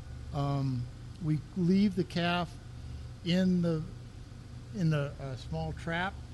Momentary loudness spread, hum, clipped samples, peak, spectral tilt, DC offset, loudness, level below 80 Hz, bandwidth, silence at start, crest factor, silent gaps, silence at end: 17 LU; none; under 0.1%; -16 dBFS; -7 dB/octave; under 0.1%; -32 LUFS; -50 dBFS; 11.5 kHz; 0 s; 16 dB; none; 0 s